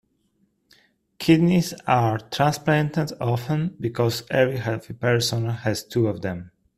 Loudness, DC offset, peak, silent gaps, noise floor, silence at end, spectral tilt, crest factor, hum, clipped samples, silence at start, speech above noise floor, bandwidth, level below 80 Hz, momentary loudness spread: -23 LUFS; under 0.1%; -4 dBFS; none; -67 dBFS; 0.3 s; -6 dB/octave; 20 dB; none; under 0.1%; 1.2 s; 45 dB; 15.5 kHz; -56 dBFS; 8 LU